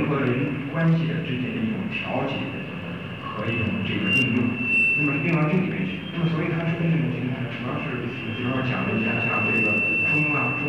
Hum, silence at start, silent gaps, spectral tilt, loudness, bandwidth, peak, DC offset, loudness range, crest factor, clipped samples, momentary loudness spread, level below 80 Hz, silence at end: none; 0 s; none; -7.5 dB/octave; -23 LUFS; 8.8 kHz; -12 dBFS; 0.2%; 4 LU; 12 dB; under 0.1%; 10 LU; -56 dBFS; 0 s